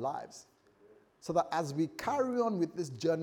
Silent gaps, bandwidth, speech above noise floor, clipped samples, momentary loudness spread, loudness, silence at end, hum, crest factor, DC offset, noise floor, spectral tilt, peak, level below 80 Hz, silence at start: none; 18.5 kHz; 30 dB; under 0.1%; 15 LU; -34 LUFS; 0 s; none; 18 dB; under 0.1%; -63 dBFS; -6 dB/octave; -16 dBFS; -72 dBFS; 0 s